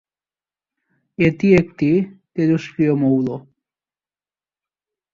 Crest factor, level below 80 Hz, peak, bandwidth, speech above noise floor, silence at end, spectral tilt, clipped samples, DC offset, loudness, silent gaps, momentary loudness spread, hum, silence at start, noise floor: 18 dB; -52 dBFS; -2 dBFS; 7.4 kHz; over 73 dB; 1.75 s; -8.5 dB/octave; under 0.1%; under 0.1%; -18 LUFS; none; 11 LU; none; 1.2 s; under -90 dBFS